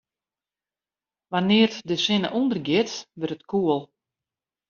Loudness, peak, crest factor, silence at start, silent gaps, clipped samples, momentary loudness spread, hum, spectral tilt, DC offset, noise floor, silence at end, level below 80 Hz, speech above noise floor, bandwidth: -24 LUFS; -6 dBFS; 20 dB; 1.3 s; none; under 0.1%; 11 LU; none; -4 dB/octave; under 0.1%; under -90 dBFS; 0.85 s; -66 dBFS; over 67 dB; 7.2 kHz